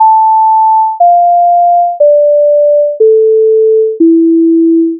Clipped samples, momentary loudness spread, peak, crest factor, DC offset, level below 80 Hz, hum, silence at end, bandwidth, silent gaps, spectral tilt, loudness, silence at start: under 0.1%; 2 LU; 0 dBFS; 6 dB; under 0.1%; -76 dBFS; none; 0 s; 1 kHz; none; -7 dB/octave; -7 LUFS; 0 s